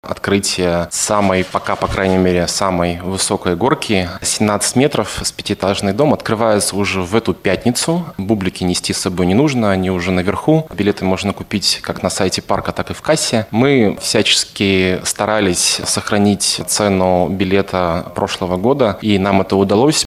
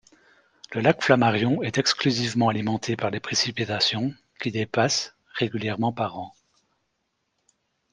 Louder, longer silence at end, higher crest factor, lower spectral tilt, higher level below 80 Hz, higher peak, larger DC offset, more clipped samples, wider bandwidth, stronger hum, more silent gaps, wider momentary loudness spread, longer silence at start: first, -15 LUFS vs -24 LUFS; second, 0 s vs 1.6 s; second, 16 dB vs 24 dB; about the same, -4 dB/octave vs -4.5 dB/octave; first, -42 dBFS vs -62 dBFS; about the same, 0 dBFS vs -2 dBFS; neither; neither; first, 15.5 kHz vs 10.5 kHz; neither; neither; second, 5 LU vs 11 LU; second, 0.05 s vs 0.7 s